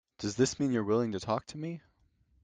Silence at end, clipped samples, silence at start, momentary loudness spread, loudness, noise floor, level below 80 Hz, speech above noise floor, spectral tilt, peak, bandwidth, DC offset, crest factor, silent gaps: 0.65 s; under 0.1%; 0.2 s; 12 LU; -32 LUFS; -69 dBFS; -64 dBFS; 38 dB; -5.5 dB/octave; -14 dBFS; 9.6 kHz; under 0.1%; 18 dB; none